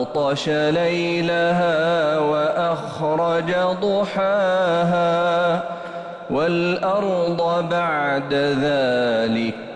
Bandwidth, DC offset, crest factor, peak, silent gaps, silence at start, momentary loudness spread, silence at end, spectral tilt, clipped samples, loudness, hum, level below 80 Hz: 9.6 kHz; under 0.1%; 10 dB; -10 dBFS; none; 0 s; 4 LU; 0 s; -6 dB/octave; under 0.1%; -20 LUFS; none; -56 dBFS